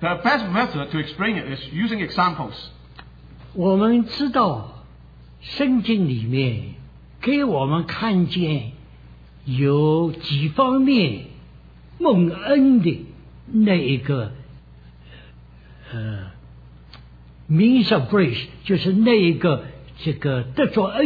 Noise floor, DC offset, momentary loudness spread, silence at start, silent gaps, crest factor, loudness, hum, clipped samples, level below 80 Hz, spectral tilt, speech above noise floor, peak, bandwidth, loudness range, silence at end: -45 dBFS; under 0.1%; 17 LU; 0 s; none; 16 dB; -20 LUFS; 60 Hz at -45 dBFS; under 0.1%; -48 dBFS; -9 dB/octave; 26 dB; -4 dBFS; 5 kHz; 6 LU; 0 s